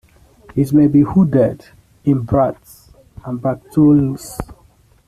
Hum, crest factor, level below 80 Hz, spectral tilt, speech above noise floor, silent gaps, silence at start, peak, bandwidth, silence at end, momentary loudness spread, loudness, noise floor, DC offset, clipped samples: none; 14 dB; -42 dBFS; -9 dB/octave; 37 dB; none; 0.55 s; -2 dBFS; 13.5 kHz; 0.55 s; 20 LU; -15 LUFS; -51 dBFS; under 0.1%; under 0.1%